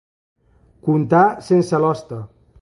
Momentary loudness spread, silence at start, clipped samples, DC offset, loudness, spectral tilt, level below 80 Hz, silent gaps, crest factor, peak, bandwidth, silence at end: 15 LU; 0.85 s; under 0.1%; under 0.1%; -17 LUFS; -8 dB/octave; -56 dBFS; none; 16 dB; -2 dBFS; 11.5 kHz; 0.35 s